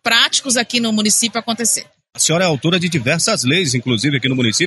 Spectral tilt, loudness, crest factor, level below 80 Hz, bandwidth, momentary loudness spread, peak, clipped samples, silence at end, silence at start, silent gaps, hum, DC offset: -3 dB/octave; -15 LUFS; 14 dB; -56 dBFS; 12 kHz; 4 LU; -2 dBFS; under 0.1%; 0 s; 0.05 s; none; none; under 0.1%